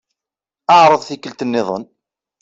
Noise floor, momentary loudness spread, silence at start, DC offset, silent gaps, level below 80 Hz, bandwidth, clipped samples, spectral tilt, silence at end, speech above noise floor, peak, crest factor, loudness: -87 dBFS; 17 LU; 0.7 s; under 0.1%; none; -64 dBFS; 7.8 kHz; under 0.1%; -4.5 dB/octave; 0.6 s; 74 dB; -2 dBFS; 14 dB; -14 LUFS